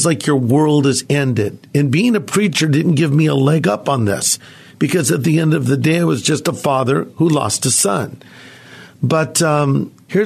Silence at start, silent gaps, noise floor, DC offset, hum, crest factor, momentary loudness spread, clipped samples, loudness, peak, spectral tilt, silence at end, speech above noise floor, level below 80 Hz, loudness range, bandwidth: 0 s; none; -39 dBFS; under 0.1%; none; 14 dB; 5 LU; under 0.1%; -15 LUFS; -2 dBFS; -5 dB/octave; 0 s; 24 dB; -58 dBFS; 2 LU; 14 kHz